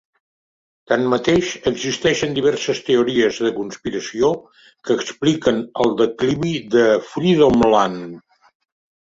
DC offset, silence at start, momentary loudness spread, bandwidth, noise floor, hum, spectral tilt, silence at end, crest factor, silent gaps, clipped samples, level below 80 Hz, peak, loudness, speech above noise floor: under 0.1%; 0.9 s; 10 LU; 7.8 kHz; under -90 dBFS; none; -5 dB/octave; 0.9 s; 18 dB; none; under 0.1%; -50 dBFS; -2 dBFS; -18 LUFS; over 72 dB